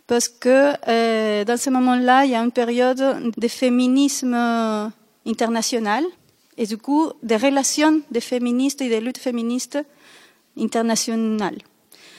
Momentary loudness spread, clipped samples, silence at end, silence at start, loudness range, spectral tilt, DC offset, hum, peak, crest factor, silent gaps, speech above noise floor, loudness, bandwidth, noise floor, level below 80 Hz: 11 LU; under 0.1%; 0.6 s; 0.1 s; 5 LU; -3 dB/octave; under 0.1%; none; -2 dBFS; 18 dB; none; 31 dB; -20 LUFS; 15 kHz; -51 dBFS; -72 dBFS